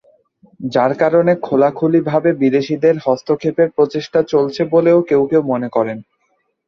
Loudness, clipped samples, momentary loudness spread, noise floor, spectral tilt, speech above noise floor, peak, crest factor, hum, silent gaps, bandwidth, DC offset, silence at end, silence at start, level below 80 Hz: -15 LUFS; under 0.1%; 6 LU; -65 dBFS; -7.5 dB/octave; 51 dB; -2 dBFS; 14 dB; none; none; 6.8 kHz; under 0.1%; 0.65 s; 0.6 s; -58 dBFS